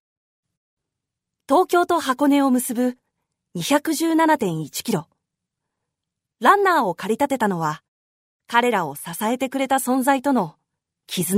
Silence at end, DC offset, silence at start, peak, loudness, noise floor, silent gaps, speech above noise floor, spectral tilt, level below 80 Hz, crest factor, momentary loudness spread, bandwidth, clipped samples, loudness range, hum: 0 s; under 0.1%; 1.5 s; 0 dBFS; -20 LUFS; -83 dBFS; 7.88-8.40 s; 64 dB; -4.5 dB/octave; -70 dBFS; 20 dB; 10 LU; 16 kHz; under 0.1%; 3 LU; none